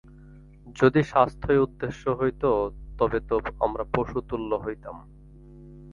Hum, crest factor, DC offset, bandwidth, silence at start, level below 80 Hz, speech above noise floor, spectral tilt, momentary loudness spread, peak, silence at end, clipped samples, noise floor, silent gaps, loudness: none; 22 dB; under 0.1%; 7.4 kHz; 0.15 s; -44 dBFS; 23 dB; -8 dB/octave; 13 LU; -4 dBFS; 0 s; under 0.1%; -48 dBFS; none; -25 LUFS